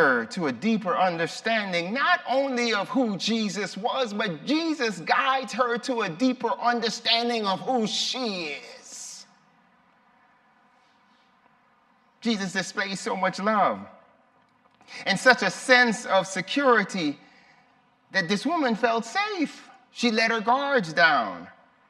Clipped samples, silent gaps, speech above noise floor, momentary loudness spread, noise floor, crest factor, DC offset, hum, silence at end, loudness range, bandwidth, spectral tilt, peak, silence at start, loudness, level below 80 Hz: under 0.1%; none; 38 dB; 11 LU; -63 dBFS; 22 dB; under 0.1%; none; 0.4 s; 9 LU; 13 kHz; -3.5 dB/octave; -4 dBFS; 0 s; -24 LUFS; -78 dBFS